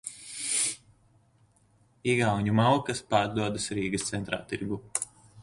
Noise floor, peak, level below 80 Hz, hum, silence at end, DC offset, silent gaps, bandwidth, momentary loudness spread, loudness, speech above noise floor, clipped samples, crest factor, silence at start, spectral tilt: -64 dBFS; -10 dBFS; -58 dBFS; none; 0 s; under 0.1%; none; 12 kHz; 10 LU; -29 LUFS; 37 dB; under 0.1%; 20 dB; 0.05 s; -4 dB/octave